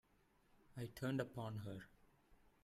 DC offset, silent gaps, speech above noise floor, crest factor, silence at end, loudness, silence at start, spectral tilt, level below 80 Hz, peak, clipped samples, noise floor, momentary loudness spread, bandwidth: under 0.1%; none; 30 dB; 22 dB; 0.15 s; -48 LUFS; 0.7 s; -7 dB/octave; -74 dBFS; -28 dBFS; under 0.1%; -76 dBFS; 14 LU; 15.5 kHz